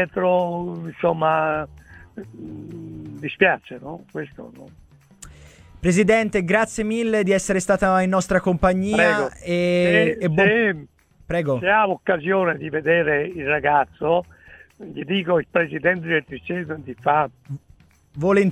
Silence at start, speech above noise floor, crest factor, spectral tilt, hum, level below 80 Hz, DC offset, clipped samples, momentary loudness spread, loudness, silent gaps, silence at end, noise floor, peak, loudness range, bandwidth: 0 s; 29 dB; 20 dB; -5.5 dB/octave; none; -46 dBFS; under 0.1%; under 0.1%; 18 LU; -20 LUFS; none; 0 s; -50 dBFS; -2 dBFS; 7 LU; 14 kHz